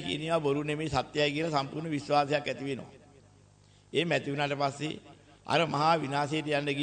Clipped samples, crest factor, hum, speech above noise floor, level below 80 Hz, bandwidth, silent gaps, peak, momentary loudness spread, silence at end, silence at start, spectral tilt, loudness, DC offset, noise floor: under 0.1%; 20 dB; 50 Hz at -60 dBFS; 30 dB; -62 dBFS; 9.4 kHz; none; -12 dBFS; 10 LU; 0 s; 0 s; -5.5 dB/octave; -30 LUFS; under 0.1%; -60 dBFS